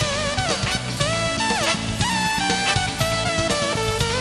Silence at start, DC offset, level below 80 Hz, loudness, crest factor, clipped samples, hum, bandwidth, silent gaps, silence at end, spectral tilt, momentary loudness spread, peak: 0 s; under 0.1%; -38 dBFS; -21 LUFS; 16 dB; under 0.1%; none; 13 kHz; none; 0 s; -3 dB/octave; 2 LU; -6 dBFS